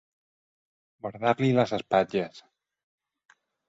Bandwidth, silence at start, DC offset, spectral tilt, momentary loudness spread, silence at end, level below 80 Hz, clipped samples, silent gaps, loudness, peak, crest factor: 7.8 kHz; 1.05 s; under 0.1%; -7 dB/octave; 15 LU; 1.3 s; -68 dBFS; under 0.1%; none; -26 LUFS; -8 dBFS; 22 dB